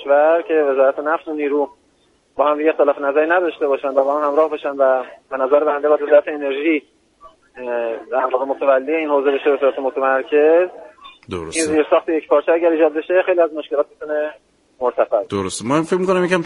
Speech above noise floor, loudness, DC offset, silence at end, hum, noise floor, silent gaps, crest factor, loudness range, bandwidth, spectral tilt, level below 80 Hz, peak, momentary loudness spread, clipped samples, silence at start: 42 dB; -17 LUFS; under 0.1%; 0 s; none; -58 dBFS; none; 16 dB; 2 LU; 11.5 kHz; -5 dB/octave; -60 dBFS; 0 dBFS; 8 LU; under 0.1%; 0 s